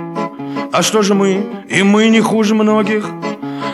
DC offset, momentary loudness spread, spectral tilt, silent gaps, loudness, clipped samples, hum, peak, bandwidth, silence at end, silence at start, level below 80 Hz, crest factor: under 0.1%; 12 LU; -4.5 dB/octave; none; -14 LUFS; under 0.1%; none; 0 dBFS; 13 kHz; 0 s; 0 s; -66 dBFS; 14 dB